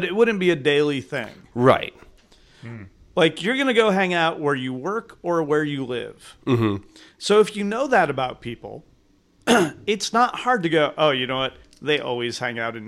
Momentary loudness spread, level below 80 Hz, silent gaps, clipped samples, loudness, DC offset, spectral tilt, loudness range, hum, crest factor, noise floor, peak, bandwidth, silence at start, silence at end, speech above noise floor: 14 LU; -56 dBFS; none; under 0.1%; -21 LUFS; under 0.1%; -5 dB/octave; 2 LU; none; 18 dB; -59 dBFS; -4 dBFS; 14 kHz; 0 s; 0 s; 37 dB